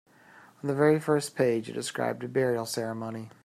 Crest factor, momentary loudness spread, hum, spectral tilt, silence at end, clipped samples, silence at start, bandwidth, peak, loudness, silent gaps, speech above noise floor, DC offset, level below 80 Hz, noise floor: 18 dB; 11 LU; none; -5.5 dB/octave; 0.15 s; under 0.1%; 0.35 s; 15 kHz; -10 dBFS; -28 LUFS; none; 27 dB; under 0.1%; -72 dBFS; -55 dBFS